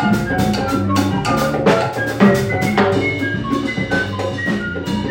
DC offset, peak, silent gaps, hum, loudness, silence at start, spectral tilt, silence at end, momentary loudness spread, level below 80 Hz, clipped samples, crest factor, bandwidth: under 0.1%; 0 dBFS; none; none; -17 LUFS; 0 s; -6 dB/octave; 0 s; 6 LU; -40 dBFS; under 0.1%; 16 dB; 17 kHz